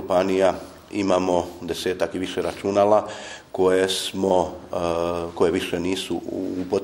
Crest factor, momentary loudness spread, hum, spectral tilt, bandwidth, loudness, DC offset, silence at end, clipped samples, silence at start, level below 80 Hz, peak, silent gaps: 18 dB; 9 LU; none; -4.5 dB/octave; 16 kHz; -23 LUFS; under 0.1%; 0 s; under 0.1%; 0 s; -54 dBFS; -4 dBFS; none